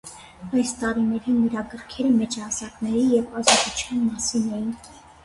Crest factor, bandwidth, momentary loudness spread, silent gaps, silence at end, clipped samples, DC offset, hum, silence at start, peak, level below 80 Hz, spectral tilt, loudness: 22 dB; 11.5 kHz; 13 LU; none; 0.25 s; under 0.1%; under 0.1%; none; 0.05 s; -2 dBFS; -52 dBFS; -3 dB/octave; -23 LUFS